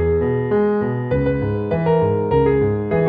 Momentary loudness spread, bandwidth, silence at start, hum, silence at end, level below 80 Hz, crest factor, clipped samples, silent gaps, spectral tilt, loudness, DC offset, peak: 4 LU; 4.9 kHz; 0 s; none; 0 s; -34 dBFS; 12 dB; under 0.1%; none; -12 dB/octave; -18 LUFS; under 0.1%; -6 dBFS